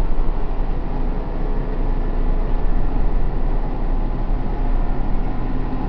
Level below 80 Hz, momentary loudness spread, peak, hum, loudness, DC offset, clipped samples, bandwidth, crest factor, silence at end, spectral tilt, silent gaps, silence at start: -18 dBFS; 2 LU; -6 dBFS; none; -26 LUFS; under 0.1%; under 0.1%; 4 kHz; 10 dB; 0 s; -10 dB/octave; none; 0 s